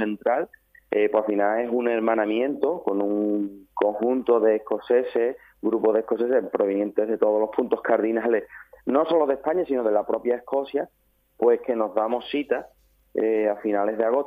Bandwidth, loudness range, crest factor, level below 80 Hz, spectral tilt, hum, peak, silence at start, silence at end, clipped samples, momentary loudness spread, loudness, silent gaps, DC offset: 4.9 kHz; 2 LU; 20 dB; -66 dBFS; -8 dB/octave; none; -4 dBFS; 0 s; 0 s; under 0.1%; 6 LU; -24 LUFS; none; under 0.1%